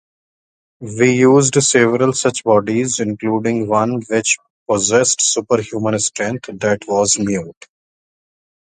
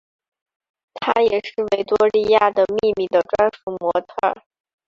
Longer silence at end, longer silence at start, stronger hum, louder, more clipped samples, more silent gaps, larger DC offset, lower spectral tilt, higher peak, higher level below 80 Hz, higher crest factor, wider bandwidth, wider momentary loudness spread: first, 1.15 s vs 0.55 s; second, 0.8 s vs 0.95 s; neither; first, -15 LUFS vs -19 LUFS; neither; first, 4.50-4.66 s vs 3.63-3.67 s; neither; second, -4 dB/octave vs -5.5 dB/octave; about the same, 0 dBFS vs -2 dBFS; about the same, -54 dBFS vs -56 dBFS; about the same, 16 dB vs 18 dB; first, 9.8 kHz vs 7.4 kHz; about the same, 9 LU vs 8 LU